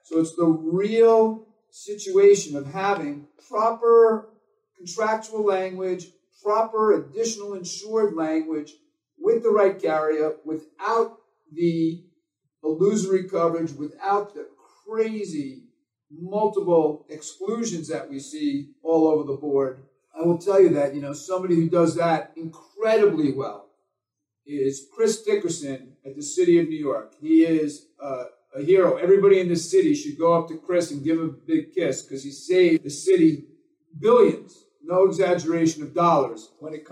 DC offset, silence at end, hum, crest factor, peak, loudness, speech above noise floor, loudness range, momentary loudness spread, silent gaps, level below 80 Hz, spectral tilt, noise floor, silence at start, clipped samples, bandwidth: under 0.1%; 0.1 s; none; 18 dB; -6 dBFS; -22 LUFS; 62 dB; 5 LU; 16 LU; none; -80 dBFS; -6 dB/octave; -84 dBFS; 0.1 s; under 0.1%; 11.5 kHz